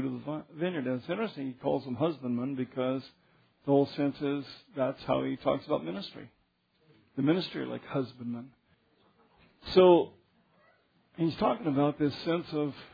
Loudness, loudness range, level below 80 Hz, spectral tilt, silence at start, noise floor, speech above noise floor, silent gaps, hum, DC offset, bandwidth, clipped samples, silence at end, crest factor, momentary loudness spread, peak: -31 LUFS; 7 LU; -66 dBFS; -8.5 dB/octave; 0 s; -72 dBFS; 42 dB; none; none; under 0.1%; 5 kHz; under 0.1%; 0.05 s; 22 dB; 13 LU; -8 dBFS